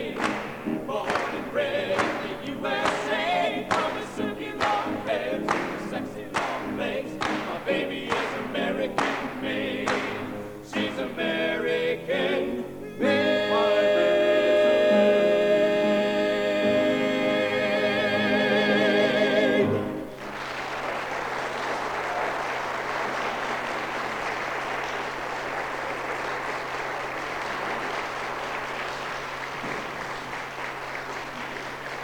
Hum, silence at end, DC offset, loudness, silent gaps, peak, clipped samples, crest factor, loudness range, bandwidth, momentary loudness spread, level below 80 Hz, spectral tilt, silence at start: none; 0 s; under 0.1%; -26 LUFS; none; -8 dBFS; under 0.1%; 18 dB; 9 LU; 19 kHz; 11 LU; -56 dBFS; -4.5 dB/octave; 0 s